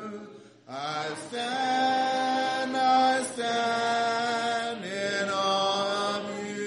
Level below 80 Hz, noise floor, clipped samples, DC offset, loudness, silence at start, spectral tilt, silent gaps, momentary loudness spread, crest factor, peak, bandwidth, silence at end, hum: -80 dBFS; -47 dBFS; under 0.1%; under 0.1%; -27 LUFS; 0 s; -3 dB/octave; none; 10 LU; 16 dB; -12 dBFS; 10.5 kHz; 0 s; none